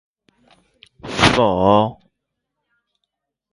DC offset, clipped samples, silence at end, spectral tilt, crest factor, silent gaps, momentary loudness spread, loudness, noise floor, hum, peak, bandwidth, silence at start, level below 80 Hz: under 0.1%; under 0.1%; 1.6 s; -5 dB/octave; 20 dB; none; 14 LU; -16 LUFS; -78 dBFS; none; 0 dBFS; 11.5 kHz; 1.05 s; -44 dBFS